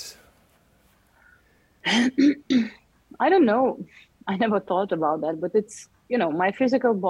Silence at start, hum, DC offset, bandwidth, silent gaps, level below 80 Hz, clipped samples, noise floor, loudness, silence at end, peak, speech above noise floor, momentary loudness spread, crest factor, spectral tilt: 0 s; none; under 0.1%; 13 kHz; none; -66 dBFS; under 0.1%; -61 dBFS; -23 LUFS; 0 s; -10 dBFS; 39 dB; 18 LU; 16 dB; -5 dB/octave